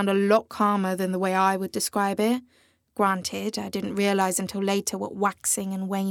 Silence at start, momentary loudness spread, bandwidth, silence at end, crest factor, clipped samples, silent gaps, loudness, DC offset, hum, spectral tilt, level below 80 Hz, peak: 0 s; 7 LU; 19 kHz; 0 s; 18 dB; under 0.1%; none; -25 LUFS; under 0.1%; none; -4.5 dB/octave; -70 dBFS; -6 dBFS